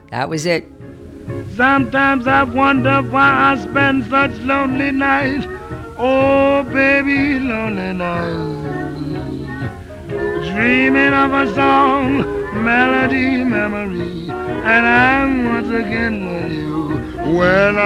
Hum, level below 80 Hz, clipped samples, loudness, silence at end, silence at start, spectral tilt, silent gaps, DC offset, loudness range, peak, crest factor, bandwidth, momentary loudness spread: none; -40 dBFS; under 0.1%; -15 LUFS; 0 s; 0.1 s; -6.5 dB/octave; none; under 0.1%; 4 LU; 0 dBFS; 16 dB; 11 kHz; 12 LU